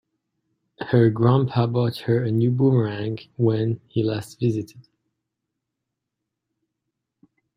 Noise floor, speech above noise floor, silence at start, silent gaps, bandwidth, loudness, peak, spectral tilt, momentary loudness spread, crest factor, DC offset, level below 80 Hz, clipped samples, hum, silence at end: -82 dBFS; 62 dB; 0.8 s; none; 11.5 kHz; -22 LUFS; -4 dBFS; -8.5 dB/octave; 10 LU; 20 dB; under 0.1%; -60 dBFS; under 0.1%; none; 2.75 s